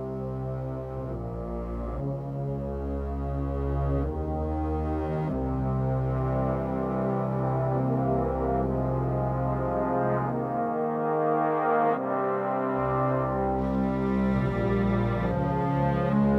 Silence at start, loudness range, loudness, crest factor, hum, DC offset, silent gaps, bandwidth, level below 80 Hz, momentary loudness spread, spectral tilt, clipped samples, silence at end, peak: 0 s; 5 LU; -28 LUFS; 14 dB; none; under 0.1%; none; 5.4 kHz; -38 dBFS; 8 LU; -10.5 dB/octave; under 0.1%; 0 s; -12 dBFS